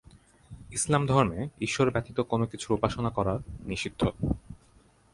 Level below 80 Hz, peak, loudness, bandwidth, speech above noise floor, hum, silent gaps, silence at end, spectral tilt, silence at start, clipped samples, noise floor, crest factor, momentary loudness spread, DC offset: -46 dBFS; -8 dBFS; -29 LUFS; 11.5 kHz; 32 dB; none; none; 0.6 s; -5.5 dB/octave; 0.5 s; under 0.1%; -60 dBFS; 22 dB; 9 LU; under 0.1%